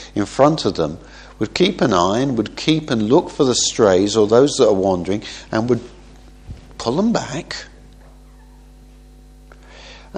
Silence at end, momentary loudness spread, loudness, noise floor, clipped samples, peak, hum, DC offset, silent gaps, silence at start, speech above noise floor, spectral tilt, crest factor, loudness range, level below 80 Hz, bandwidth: 0 s; 12 LU; -17 LUFS; -43 dBFS; under 0.1%; 0 dBFS; none; under 0.1%; none; 0 s; 26 dB; -4.5 dB/octave; 18 dB; 10 LU; -44 dBFS; 10 kHz